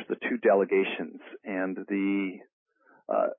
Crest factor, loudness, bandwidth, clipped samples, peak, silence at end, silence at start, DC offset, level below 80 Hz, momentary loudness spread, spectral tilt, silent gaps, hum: 16 dB; -28 LUFS; 3.8 kHz; under 0.1%; -12 dBFS; 0.05 s; 0 s; under 0.1%; -84 dBFS; 17 LU; -10 dB/octave; 2.53-2.66 s; none